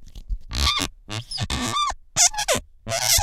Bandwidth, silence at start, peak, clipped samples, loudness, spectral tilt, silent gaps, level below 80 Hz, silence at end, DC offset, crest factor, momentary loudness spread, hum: 16.5 kHz; 0 s; -2 dBFS; under 0.1%; -22 LUFS; -1.5 dB/octave; none; -34 dBFS; 0 s; under 0.1%; 22 dB; 14 LU; none